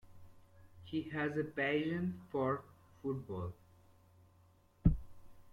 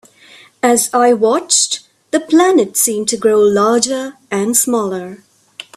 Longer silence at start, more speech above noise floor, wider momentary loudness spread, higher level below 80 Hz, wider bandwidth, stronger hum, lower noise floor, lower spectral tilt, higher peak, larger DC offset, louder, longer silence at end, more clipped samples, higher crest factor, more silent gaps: second, 0.05 s vs 0.65 s; about the same, 29 dB vs 30 dB; about the same, 11 LU vs 11 LU; first, -48 dBFS vs -60 dBFS; second, 11 kHz vs 16 kHz; neither; first, -67 dBFS vs -43 dBFS; first, -8.5 dB/octave vs -2.5 dB/octave; second, -16 dBFS vs 0 dBFS; neither; second, -38 LUFS vs -13 LUFS; about the same, 0.05 s vs 0.15 s; neither; first, 24 dB vs 14 dB; neither